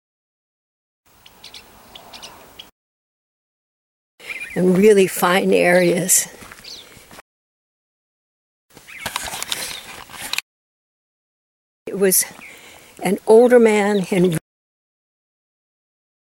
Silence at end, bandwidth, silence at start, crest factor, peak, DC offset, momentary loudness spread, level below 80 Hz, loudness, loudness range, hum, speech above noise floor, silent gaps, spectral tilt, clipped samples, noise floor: 1.9 s; 19.5 kHz; 1.55 s; 20 dB; 0 dBFS; under 0.1%; 25 LU; -60 dBFS; -16 LUFS; 14 LU; none; 31 dB; 2.72-4.18 s, 7.21-8.69 s, 10.43-11.86 s; -4 dB/octave; under 0.1%; -45 dBFS